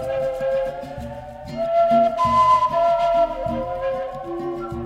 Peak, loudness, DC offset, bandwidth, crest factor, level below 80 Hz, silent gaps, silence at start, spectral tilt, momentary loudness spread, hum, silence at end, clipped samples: -6 dBFS; -20 LUFS; under 0.1%; 11 kHz; 14 dB; -44 dBFS; none; 0 s; -6.5 dB/octave; 16 LU; none; 0 s; under 0.1%